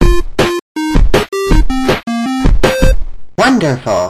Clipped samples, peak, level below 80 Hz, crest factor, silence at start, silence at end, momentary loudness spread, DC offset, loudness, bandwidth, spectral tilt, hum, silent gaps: under 0.1%; 0 dBFS; -14 dBFS; 10 dB; 0 s; 0 s; 5 LU; under 0.1%; -13 LUFS; 14 kHz; -5.5 dB/octave; none; 0.62-0.75 s